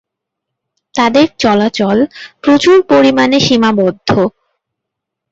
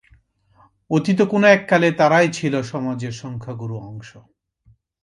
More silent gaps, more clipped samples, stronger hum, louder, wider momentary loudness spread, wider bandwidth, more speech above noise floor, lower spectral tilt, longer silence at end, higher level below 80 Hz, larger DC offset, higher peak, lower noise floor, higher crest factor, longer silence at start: neither; neither; neither; first, -11 LUFS vs -18 LUFS; second, 8 LU vs 17 LU; second, 8 kHz vs 11.5 kHz; first, 68 dB vs 39 dB; about the same, -5 dB/octave vs -6 dB/octave; first, 1.05 s vs 0.85 s; first, -48 dBFS vs -60 dBFS; neither; about the same, 0 dBFS vs -2 dBFS; first, -78 dBFS vs -57 dBFS; second, 12 dB vs 18 dB; about the same, 0.95 s vs 0.9 s